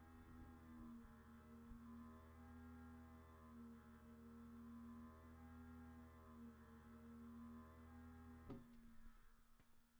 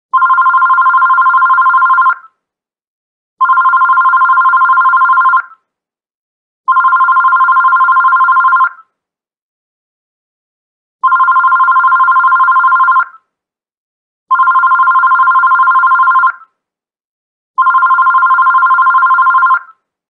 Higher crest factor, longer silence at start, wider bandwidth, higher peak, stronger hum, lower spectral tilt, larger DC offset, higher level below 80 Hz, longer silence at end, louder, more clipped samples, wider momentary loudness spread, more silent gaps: first, 16 dB vs 10 dB; second, 0 s vs 0.15 s; first, over 20 kHz vs 4.4 kHz; second, -44 dBFS vs 0 dBFS; neither; first, -7.5 dB/octave vs 0 dB/octave; neither; first, -68 dBFS vs -86 dBFS; second, 0 s vs 0.5 s; second, -62 LUFS vs -8 LUFS; neither; about the same, 5 LU vs 5 LU; second, none vs 2.87-3.37 s, 6.14-6.64 s, 9.42-10.99 s, 13.77-14.26 s, 17.04-17.54 s